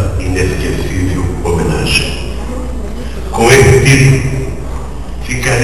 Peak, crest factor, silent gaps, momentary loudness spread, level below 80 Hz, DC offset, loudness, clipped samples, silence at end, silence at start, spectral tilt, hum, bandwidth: 0 dBFS; 12 dB; none; 17 LU; -20 dBFS; 6%; -12 LUFS; 0.7%; 0 s; 0 s; -5 dB/octave; none; 14 kHz